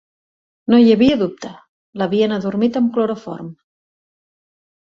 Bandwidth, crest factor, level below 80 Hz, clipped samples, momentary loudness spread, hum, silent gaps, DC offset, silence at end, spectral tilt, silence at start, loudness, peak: 7 kHz; 16 dB; -54 dBFS; under 0.1%; 22 LU; none; 1.69-1.93 s; under 0.1%; 1.35 s; -7 dB/octave; 0.7 s; -16 LUFS; -2 dBFS